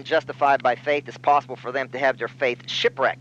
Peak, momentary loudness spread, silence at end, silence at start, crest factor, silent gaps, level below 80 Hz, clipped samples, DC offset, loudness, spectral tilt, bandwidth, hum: -6 dBFS; 6 LU; 0 s; 0 s; 16 dB; none; -70 dBFS; under 0.1%; under 0.1%; -23 LUFS; -4 dB/octave; 8 kHz; none